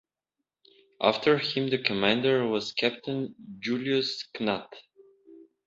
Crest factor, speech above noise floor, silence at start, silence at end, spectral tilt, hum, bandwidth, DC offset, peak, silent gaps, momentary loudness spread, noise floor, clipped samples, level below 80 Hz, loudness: 24 dB; 59 dB; 1 s; 0.3 s; -5.5 dB/octave; none; 7.8 kHz; under 0.1%; -6 dBFS; none; 10 LU; -86 dBFS; under 0.1%; -68 dBFS; -27 LUFS